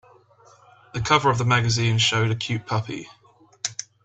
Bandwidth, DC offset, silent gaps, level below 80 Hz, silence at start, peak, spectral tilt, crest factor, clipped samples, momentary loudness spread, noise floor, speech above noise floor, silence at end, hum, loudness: 8.4 kHz; under 0.1%; none; -52 dBFS; 0.95 s; -4 dBFS; -4 dB/octave; 20 dB; under 0.1%; 13 LU; -54 dBFS; 33 dB; 0.2 s; none; -22 LUFS